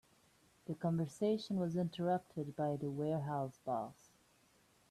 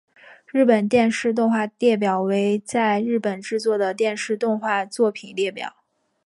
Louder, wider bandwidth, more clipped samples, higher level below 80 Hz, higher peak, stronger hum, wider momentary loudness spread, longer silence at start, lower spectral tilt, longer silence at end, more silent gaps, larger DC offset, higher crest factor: second, -39 LUFS vs -21 LUFS; first, 13.5 kHz vs 11.5 kHz; neither; second, -76 dBFS vs -66 dBFS; second, -24 dBFS vs -4 dBFS; neither; about the same, 7 LU vs 8 LU; first, 0.7 s vs 0.3 s; first, -7.5 dB/octave vs -5.5 dB/octave; first, 1 s vs 0.55 s; neither; neither; about the same, 16 dB vs 16 dB